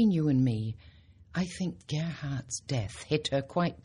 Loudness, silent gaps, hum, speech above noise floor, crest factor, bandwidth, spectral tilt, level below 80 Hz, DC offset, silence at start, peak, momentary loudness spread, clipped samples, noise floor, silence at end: -32 LUFS; none; none; 26 dB; 16 dB; 11 kHz; -6 dB/octave; -56 dBFS; under 0.1%; 0 s; -14 dBFS; 10 LU; under 0.1%; -55 dBFS; 0.05 s